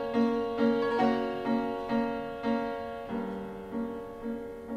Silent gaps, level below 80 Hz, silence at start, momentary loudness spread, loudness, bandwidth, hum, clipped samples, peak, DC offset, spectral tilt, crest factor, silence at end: none; -56 dBFS; 0 s; 11 LU; -31 LUFS; 8.6 kHz; none; under 0.1%; -16 dBFS; under 0.1%; -7 dB/octave; 16 dB; 0 s